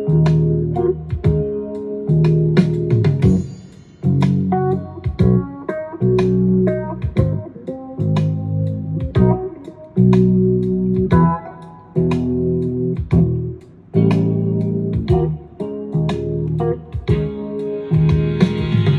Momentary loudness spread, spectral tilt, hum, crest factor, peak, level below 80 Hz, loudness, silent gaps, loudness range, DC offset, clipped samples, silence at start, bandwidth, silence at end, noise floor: 11 LU; -10 dB/octave; none; 16 dB; 0 dBFS; -34 dBFS; -18 LUFS; none; 3 LU; under 0.1%; under 0.1%; 0 s; 7.2 kHz; 0 s; -38 dBFS